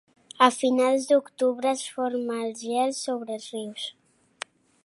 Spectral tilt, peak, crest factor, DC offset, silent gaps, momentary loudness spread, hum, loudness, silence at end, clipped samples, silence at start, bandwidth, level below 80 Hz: -2.5 dB/octave; -2 dBFS; 24 dB; under 0.1%; none; 15 LU; none; -25 LUFS; 0.95 s; under 0.1%; 0.4 s; 11.5 kHz; -84 dBFS